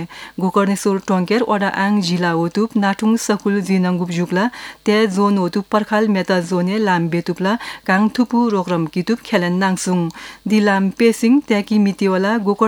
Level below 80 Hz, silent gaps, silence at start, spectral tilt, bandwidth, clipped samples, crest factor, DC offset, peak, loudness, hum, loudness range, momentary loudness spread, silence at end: -58 dBFS; none; 0 s; -6 dB/octave; 17 kHz; under 0.1%; 16 dB; under 0.1%; 0 dBFS; -17 LUFS; none; 1 LU; 5 LU; 0 s